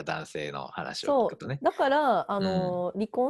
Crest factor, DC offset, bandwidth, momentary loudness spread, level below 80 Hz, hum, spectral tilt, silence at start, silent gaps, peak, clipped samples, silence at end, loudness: 16 dB; under 0.1%; 12 kHz; 11 LU; -62 dBFS; none; -6 dB/octave; 0 s; none; -12 dBFS; under 0.1%; 0 s; -28 LUFS